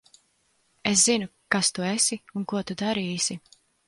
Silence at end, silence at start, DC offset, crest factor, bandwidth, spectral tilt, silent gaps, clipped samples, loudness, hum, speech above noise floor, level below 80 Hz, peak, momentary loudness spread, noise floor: 0.5 s; 0.85 s; under 0.1%; 22 dB; 11.5 kHz; -2.5 dB/octave; none; under 0.1%; -24 LUFS; none; 43 dB; -64 dBFS; -4 dBFS; 11 LU; -68 dBFS